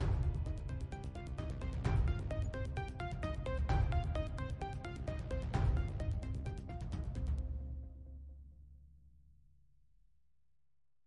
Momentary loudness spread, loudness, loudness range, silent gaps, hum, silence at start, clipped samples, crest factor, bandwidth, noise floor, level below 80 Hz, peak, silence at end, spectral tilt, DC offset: 13 LU; -40 LUFS; 10 LU; none; none; 0 s; under 0.1%; 16 dB; 10.5 kHz; -87 dBFS; -42 dBFS; -22 dBFS; 1.95 s; -7.5 dB/octave; under 0.1%